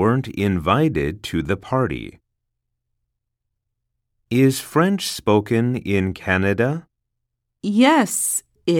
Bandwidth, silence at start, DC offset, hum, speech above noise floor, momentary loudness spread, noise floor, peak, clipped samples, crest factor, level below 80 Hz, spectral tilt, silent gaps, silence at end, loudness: 18 kHz; 0 s; under 0.1%; none; 59 dB; 8 LU; -78 dBFS; -2 dBFS; under 0.1%; 18 dB; -46 dBFS; -5 dB/octave; none; 0 s; -20 LUFS